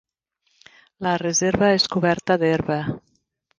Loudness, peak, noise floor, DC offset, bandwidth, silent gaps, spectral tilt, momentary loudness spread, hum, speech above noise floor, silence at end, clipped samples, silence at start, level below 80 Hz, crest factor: -21 LUFS; -4 dBFS; -70 dBFS; under 0.1%; 10.5 kHz; none; -4 dB/octave; 10 LU; none; 50 dB; 0.6 s; under 0.1%; 1 s; -52 dBFS; 18 dB